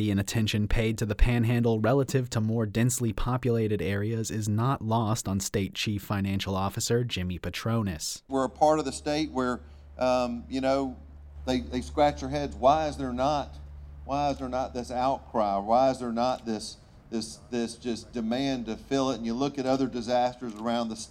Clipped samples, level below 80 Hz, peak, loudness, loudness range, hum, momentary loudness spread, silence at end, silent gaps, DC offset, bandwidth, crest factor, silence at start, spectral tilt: under 0.1%; -40 dBFS; -8 dBFS; -28 LUFS; 3 LU; none; 9 LU; 0 s; none; under 0.1%; 18 kHz; 20 dB; 0 s; -5.5 dB/octave